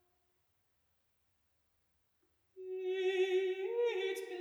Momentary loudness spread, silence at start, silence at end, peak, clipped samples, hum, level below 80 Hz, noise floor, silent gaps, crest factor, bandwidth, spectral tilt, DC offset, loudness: 10 LU; 2.55 s; 0 s; -24 dBFS; under 0.1%; none; under -90 dBFS; -79 dBFS; none; 16 dB; 13 kHz; -2.5 dB/octave; under 0.1%; -36 LUFS